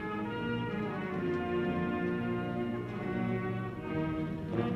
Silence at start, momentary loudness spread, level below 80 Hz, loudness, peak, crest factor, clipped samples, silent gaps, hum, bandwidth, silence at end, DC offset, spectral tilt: 0 s; 4 LU; -56 dBFS; -35 LUFS; -18 dBFS; 16 dB; under 0.1%; none; 50 Hz at -50 dBFS; 8.2 kHz; 0 s; under 0.1%; -8.5 dB/octave